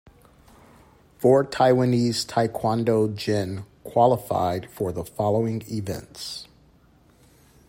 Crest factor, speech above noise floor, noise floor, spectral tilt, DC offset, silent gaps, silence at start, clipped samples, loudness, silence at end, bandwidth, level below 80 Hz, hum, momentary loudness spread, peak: 20 dB; 34 dB; -57 dBFS; -6 dB/octave; under 0.1%; none; 1.2 s; under 0.1%; -23 LUFS; 1.25 s; 16 kHz; -58 dBFS; none; 14 LU; -6 dBFS